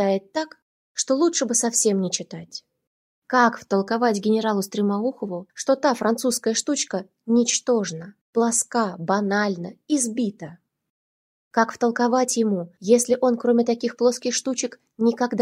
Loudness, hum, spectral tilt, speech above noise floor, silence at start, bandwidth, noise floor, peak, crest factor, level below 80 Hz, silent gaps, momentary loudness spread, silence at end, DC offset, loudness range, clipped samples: -22 LUFS; none; -3.5 dB/octave; over 68 dB; 0 s; 16 kHz; under -90 dBFS; -4 dBFS; 20 dB; -72 dBFS; 0.62-0.95 s, 2.87-3.22 s, 8.21-8.33 s, 10.90-11.51 s; 11 LU; 0 s; under 0.1%; 3 LU; under 0.1%